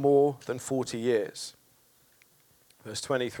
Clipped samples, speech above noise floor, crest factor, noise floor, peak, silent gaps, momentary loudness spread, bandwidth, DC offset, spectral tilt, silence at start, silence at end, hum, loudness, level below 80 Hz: under 0.1%; 36 dB; 18 dB; -64 dBFS; -12 dBFS; none; 16 LU; 19 kHz; under 0.1%; -5 dB/octave; 0 s; 0 s; none; -30 LUFS; -74 dBFS